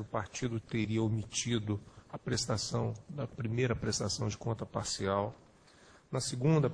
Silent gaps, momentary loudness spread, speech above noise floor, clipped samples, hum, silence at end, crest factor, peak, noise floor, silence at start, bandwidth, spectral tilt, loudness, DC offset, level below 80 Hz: none; 8 LU; 26 dB; under 0.1%; none; 0 s; 18 dB; -18 dBFS; -60 dBFS; 0 s; 10.5 kHz; -5 dB/octave; -35 LUFS; under 0.1%; -58 dBFS